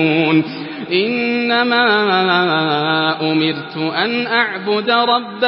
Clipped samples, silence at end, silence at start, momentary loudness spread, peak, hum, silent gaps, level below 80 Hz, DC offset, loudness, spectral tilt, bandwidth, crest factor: under 0.1%; 0 s; 0 s; 6 LU; -2 dBFS; none; none; -68 dBFS; under 0.1%; -15 LUFS; -10.5 dB/octave; 5.8 kHz; 14 dB